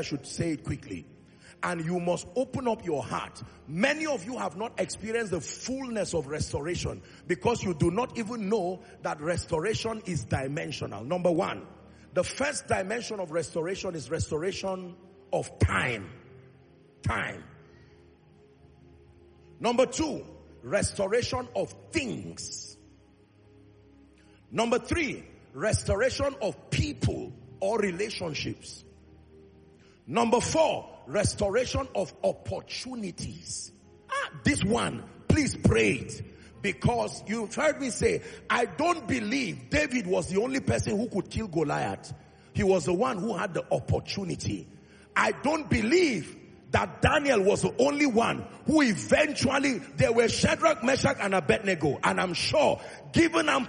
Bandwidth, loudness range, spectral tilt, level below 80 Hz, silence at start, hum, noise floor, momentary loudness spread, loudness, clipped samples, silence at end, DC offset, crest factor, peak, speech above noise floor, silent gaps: 10 kHz; 8 LU; -5 dB/octave; -50 dBFS; 0 s; none; -59 dBFS; 12 LU; -28 LUFS; under 0.1%; 0 s; under 0.1%; 22 dB; -8 dBFS; 30 dB; none